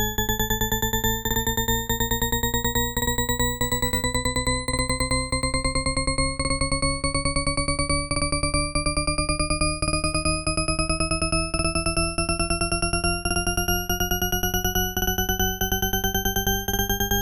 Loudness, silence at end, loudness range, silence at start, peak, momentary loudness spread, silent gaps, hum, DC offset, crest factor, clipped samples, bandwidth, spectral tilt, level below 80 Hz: -23 LUFS; 0 s; 1 LU; 0 s; -10 dBFS; 1 LU; none; none; under 0.1%; 14 dB; under 0.1%; 16.5 kHz; -3 dB/octave; -30 dBFS